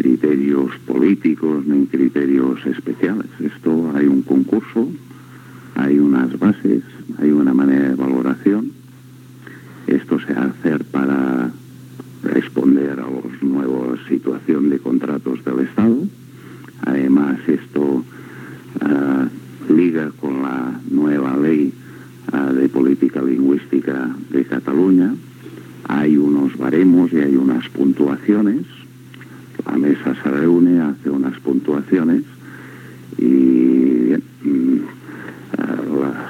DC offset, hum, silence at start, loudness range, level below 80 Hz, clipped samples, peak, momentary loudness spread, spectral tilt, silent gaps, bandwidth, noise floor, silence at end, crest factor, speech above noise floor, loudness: under 0.1%; none; 0 s; 4 LU; -66 dBFS; under 0.1%; -2 dBFS; 16 LU; -8.5 dB/octave; none; 6.6 kHz; -40 dBFS; 0 s; 16 dB; 24 dB; -17 LUFS